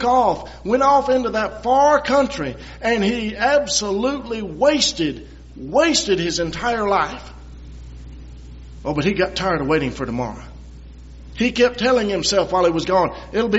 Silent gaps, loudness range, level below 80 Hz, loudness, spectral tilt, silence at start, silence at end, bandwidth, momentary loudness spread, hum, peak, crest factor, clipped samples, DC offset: none; 6 LU; -40 dBFS; -19 LUFS; -3 dB/octave; 0 s; 0 s; 8 kHz; 21 LU; none; -4 dBFS; 16 dB; under 0.1%; under 0.1%